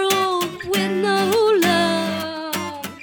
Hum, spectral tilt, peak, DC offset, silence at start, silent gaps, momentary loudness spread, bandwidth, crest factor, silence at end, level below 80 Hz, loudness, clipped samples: none; -4 dB/octave; -6 dBFS; under 0.1%; 0 s; none; 10 LU; 18 kHz; 14 dB; 0 s; -60 dBFS; -20 LUFS; under 0.1%